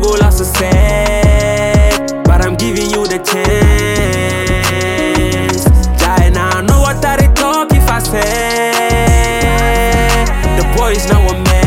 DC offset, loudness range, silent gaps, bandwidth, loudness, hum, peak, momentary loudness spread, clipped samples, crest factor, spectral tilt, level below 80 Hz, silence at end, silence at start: under 0.1%; 1 LU; none; 16.5 kHz; -11 LUFS; none; 0 dBFS; 3 LU; under 0.1%; 10 dB; -5 dB/octave; -14 dBFS; 0 s; 0 s